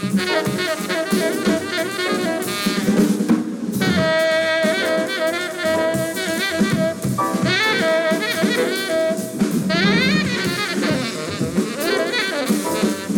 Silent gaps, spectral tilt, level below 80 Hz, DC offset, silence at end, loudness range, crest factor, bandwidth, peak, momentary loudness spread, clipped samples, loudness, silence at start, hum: none; -4.5 dB/octave; -54 dBFS; under 0.1%; 0 s; 1 LU; 14 dB; 18.5 kHz; -6 dBFS; 5 LU; under 0.1%; -19 LUFS; 0 s; none